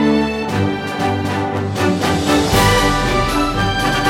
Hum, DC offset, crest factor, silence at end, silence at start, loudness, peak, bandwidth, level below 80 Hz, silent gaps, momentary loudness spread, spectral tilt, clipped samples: none; under 0.1%; 14 dB; 0 s; 0 s; -16 LUFS; -2 dBFS; 16.5 kHz; -28 dBFS; none; 7 LU; -5 dB/octave; under 0.1%